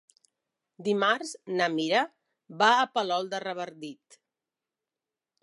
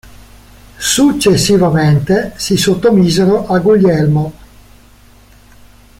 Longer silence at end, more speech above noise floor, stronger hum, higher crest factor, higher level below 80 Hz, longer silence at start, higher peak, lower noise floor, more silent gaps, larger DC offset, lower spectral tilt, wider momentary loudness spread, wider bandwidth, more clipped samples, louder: second, 1.5 s vs 1.7 s; first, over 62 dB vs 32 dB; neither; first, 22 dB vs 12 dB; second, -84 dBFS vs -38 dBFS; about the same, 0.8 s vs 0.8 s; second, -8 dBFS vs 0 dBFS; first, under -90 dBFS vs -42 dBFS; neither; neither; second, -3.5 dB/octave vs -5.5 dB/octave; first, 14 LU vs 6 LU; second, 11.5 kHz vs 16.5 kHz; neither; second, -27 LUFS vs -11 LUFS